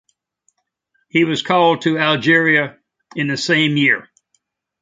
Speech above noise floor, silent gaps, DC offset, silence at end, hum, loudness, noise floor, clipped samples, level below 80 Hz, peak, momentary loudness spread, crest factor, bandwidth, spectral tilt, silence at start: 53 dB; none; under 0.1%; 0.8 s; none; -16 LUFS; -68 dBFS; under 0.1%; -64 dBFS; 0 dBFS; 9 LU; 18 dB; 9.2 kHz; -5 dB/octave; 1.15 s